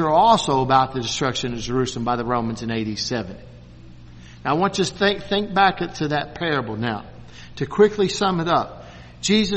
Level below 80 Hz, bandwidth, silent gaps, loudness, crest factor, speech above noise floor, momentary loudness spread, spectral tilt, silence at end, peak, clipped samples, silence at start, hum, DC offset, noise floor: -46 dBFS; 8.8 kHz; none; -21 LUFS; 20 dB; 21 dB; 14 LU; -4.5 dB/octave; 0 s; -2 dBFS; under 0.1%; 0 s; none; under 0.1%; -42 dBFS